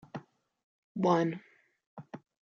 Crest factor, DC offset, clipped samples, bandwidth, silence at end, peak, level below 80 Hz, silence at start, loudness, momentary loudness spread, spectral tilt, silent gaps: 22 dB; under 0.1%; under 0.1%; 7.2 kHz; 0.35 s; -14 dBFS; -80 dBFS; 0.15 s; -30 LUFS; 24 LU; -6.5 dB/octave; 0.64-0.95 s, 1.86-1.97 s